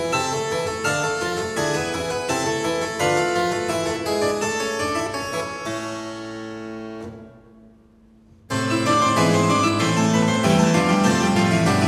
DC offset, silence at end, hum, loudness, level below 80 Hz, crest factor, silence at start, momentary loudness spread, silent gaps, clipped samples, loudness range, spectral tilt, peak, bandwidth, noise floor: under 0.1%; 0 s; none; -21 LUFS; -52 dBFS; 16 dB; 0 s; 14 LU; none; under 0.1%; 11 LU; -4.5 dB/octave; -4 dBFS; 15.5 kHz; -52 dBFS